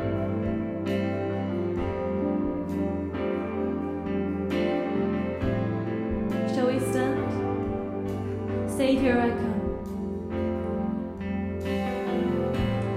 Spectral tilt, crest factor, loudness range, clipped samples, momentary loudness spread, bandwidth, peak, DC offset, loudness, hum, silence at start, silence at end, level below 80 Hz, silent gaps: -7.5 dB/octave; 16 dB; 2 LU; under 0.1%; 6 LU; 15 kHz; -12 dBFS; under 0.1%; -28 LUFS; none; 0 s; 0 s; -44 dBFS; none